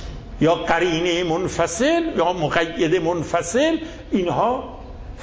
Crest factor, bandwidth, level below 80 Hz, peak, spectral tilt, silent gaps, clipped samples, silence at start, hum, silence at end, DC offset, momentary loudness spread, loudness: 16 dB; 8 kHz; -40 dBFS; -4 dBFS; -4.5 dB/octave; none; under 0.1%; 0 s; none; 0 s; under 0.1%; 8 LU; -20 LUFS